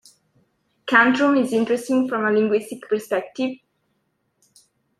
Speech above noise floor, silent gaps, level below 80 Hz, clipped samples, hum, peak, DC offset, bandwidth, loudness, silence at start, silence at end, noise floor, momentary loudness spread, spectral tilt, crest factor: 51 dB; none; -70 dBFS; under 0.1%; none; -2 dBFS; under 0.1%; 13.5 kHz; -20 LUFS; 0.85 s; 1.45 s; -71 dBFS; 12 LU; -5 dB/octave; 22 dB